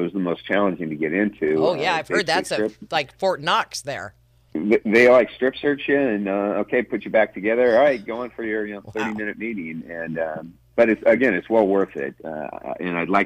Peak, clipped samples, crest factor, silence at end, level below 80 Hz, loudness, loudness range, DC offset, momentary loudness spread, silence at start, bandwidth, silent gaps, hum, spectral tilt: -6 dBFS; under 0.1%; 16 dB; 0 s; -58 dBFS; -21 LUFS; 4 LU; under 0.1%; 13 LU; 0 s; 14 kHz; none; none; -5 dB/octave